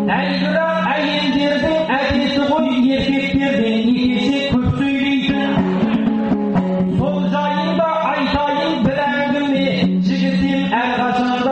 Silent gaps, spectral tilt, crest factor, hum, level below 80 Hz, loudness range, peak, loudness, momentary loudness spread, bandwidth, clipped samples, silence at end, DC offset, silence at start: none; -7 dB/octave; 10 dB; none; -40 dBFS; 1 LU; -6 dBFS; -17 LUFS; 2 LU; 8.4 kHz; under 0.1%; 0 s; under 0.1%; 0 s